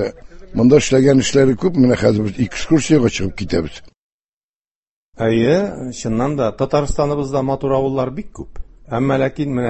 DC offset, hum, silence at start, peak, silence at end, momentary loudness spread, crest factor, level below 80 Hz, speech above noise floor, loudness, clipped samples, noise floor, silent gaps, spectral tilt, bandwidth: under 0.1%; none; 0 s; 0 dBFS; 0 s; 13 LU; 16 dB; -38 dBFS; over 74 dB; -17 LUFS; under 0.1%; under -90 dBFS; 3.97-5.12 s; -6 dB/octave; 8.6 kHz